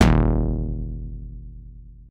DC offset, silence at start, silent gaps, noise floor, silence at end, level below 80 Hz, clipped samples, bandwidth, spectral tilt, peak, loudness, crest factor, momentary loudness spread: under 0.1%; 0 s; none; -42 dBFS; 0.05 s; -26 dBFS; under 0.1%; 9.6 kHz; -7 dB/octave; 0 dBFS; -24 LUFS; 22 dB; 23 LU